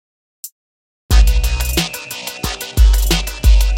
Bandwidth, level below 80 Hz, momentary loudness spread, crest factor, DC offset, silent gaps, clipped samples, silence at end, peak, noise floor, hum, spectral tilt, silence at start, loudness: 17 kHz; -14 dBFS; 21 LU; 14 dB; under 0.1%; 0.52-1.09 s; under 0.1%; 0 s; 0 dBFS; under -90 dBFS; none; -4 dB/octave; 0.45 s; -17 LUFS